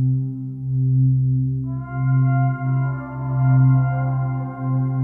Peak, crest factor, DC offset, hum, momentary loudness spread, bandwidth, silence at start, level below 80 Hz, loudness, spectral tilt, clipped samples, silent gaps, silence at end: -8 dBFS; 12 dB; under 0.1%; none; 9 LU; 2.2 kHz; 0 s; -46 dBFS; -20 LUFS; -13.5 dB/octave; under 0.1%; none; 0 s